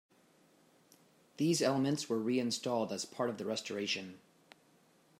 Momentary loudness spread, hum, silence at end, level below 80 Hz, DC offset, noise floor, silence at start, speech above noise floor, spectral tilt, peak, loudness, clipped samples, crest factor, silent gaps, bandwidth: 8 LU; none; 1 s; -84 dBFS; under 0.1%; -68 dBFS; 1.4 s; 33 dB; -4.5 dB/octave; -18 dBFS; -35 LUFS; under 0.1%; 20 dB; none; 16 kHz